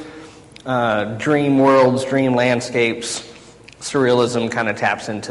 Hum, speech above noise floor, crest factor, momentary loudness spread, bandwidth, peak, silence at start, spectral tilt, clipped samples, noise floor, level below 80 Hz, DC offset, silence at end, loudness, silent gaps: none; 25 dB; 14 dB; 12 LU; 11.5 kHz; -4 dBFS; 0 s; -5 dB/octave; under 0.1%; -42 dBFS; -54 dBFS; under 0.1%; 0 s; -18 LUFS; none